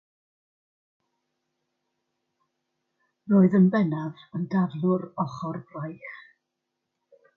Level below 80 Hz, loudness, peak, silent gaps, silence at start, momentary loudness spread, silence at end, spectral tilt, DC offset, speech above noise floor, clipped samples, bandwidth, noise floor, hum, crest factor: -72 dBFS; -25 LUFS; -8 dBFS; none; 3.25 s; 18 LU; 1.15 s; -10 dB/octave; under 0.1%; 58 dB; under 0.1%; 5.6 kHz; -82 dBFS; none; 20 dB